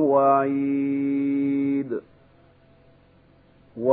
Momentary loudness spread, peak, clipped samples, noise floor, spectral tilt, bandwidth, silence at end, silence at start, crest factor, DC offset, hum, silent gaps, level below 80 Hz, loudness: 13 LU; -8 dBFS; under 0.1%; -56 dBFS; -12.5 dB/octave; 3.9 kHz; 0 s; 0 s; 16 dB; under 0.1%; none; none; -66 dBFS; -23 LUFS